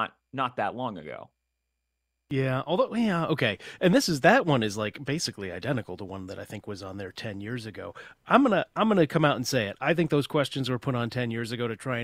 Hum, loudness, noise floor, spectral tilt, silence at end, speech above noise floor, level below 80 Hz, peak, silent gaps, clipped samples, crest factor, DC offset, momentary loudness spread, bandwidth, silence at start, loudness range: none; -27 LUFS; -81 dBFS; -5.5 dB/octave; 0 s; 54 dB; -62 dBFS; -4 dBFS; none; under 0.1%; 22 dB; under 0.1%; 17 LU; 16 kHz; 0 s; 6 LU